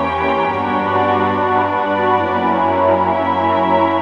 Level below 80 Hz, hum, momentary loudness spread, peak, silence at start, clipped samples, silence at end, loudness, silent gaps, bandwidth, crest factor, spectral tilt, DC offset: -48 dBFS; none; 3 LU; -2 dBFS; 0 s; under 0.1%; 0 s; -15 LUFS; none; 7.6 kHz; 14 dB; -7.5 dB/octave; under 0.1%